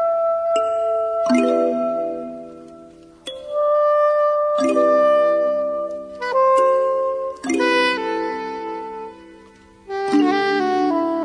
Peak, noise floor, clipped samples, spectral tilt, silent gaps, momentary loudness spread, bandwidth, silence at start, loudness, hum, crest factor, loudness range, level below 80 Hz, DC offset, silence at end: -4 dBFS; -47 dBFS; under 0.1%; -4 dB/octave; none; 15 LU; 10.5 kHz; 0 s; -19 LUFS; none; 14 dB; 4 LU; -60 dBFS; under 0.1%; 0 s